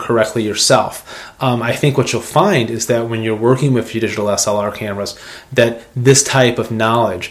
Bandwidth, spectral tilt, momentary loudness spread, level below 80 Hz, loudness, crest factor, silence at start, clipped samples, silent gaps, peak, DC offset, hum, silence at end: 15.5 kHz; -4.5 dB/octave; 10 LU; -50 dBFS; -15 LUFS; 16 dB; 0 s; under 0.1%; none; 0 dBFS; under 0.1%; none; 0 s